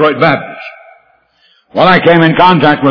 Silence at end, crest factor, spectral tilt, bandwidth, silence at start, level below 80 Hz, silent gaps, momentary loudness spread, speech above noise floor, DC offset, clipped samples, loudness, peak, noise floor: 0 s; 10 dB; -8 dB/octave; 5.4 kHz; 0 s; -46 dBFS; none; 20 LU; 44 dB; under 0.1%; 1%; -8 LUFS; 0 dBFS; -52 dBFS